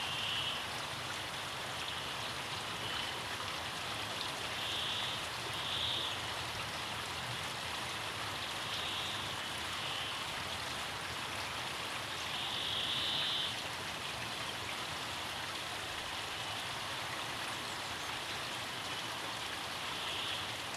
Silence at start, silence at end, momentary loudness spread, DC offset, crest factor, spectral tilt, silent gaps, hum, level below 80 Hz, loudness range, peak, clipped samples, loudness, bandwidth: 0 s; 0 s; 5 LU; under 0.1%; 16 dB; -1.5 dB/octave; none; none; -64 dBFS; 3 LU; -24 dBFS; under 0.1%; -37 LUFS; 16 kHz